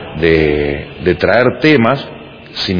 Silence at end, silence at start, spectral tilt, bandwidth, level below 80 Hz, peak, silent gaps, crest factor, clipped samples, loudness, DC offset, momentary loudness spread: 0 s; 0 s; -7 dB/octave; 5.4 kHz; -34 dBFS; 0 dBFS; none; 14 dB; 0.2%; -13 LUFS; under 0.1%; 15 LU